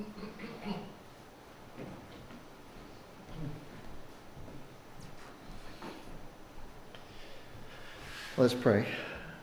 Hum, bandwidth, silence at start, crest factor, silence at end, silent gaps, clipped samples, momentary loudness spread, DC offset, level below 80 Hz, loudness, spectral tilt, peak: none; over 20 kHz; 0 s; 26 dB; 0 s; none; under 0.1%; 23 LU; under 0.1%; -54 dBFS; -36 LUFS; -6 dB/octave; -14 dBFS